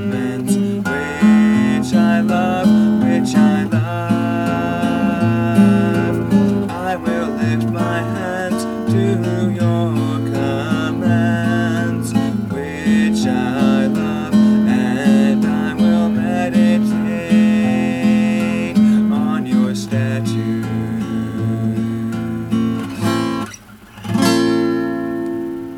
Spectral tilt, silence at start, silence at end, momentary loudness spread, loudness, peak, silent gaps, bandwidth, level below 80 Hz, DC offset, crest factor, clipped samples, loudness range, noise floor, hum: -7 dB/octave; 0 s; 0 s; 8 LU; -16 LUFS; -2 dBFS; none; 13.5 kHz; -46 dBFS; under 0.1%; 14 dB; under 0.1%; 5 LU; -38 dBFS; none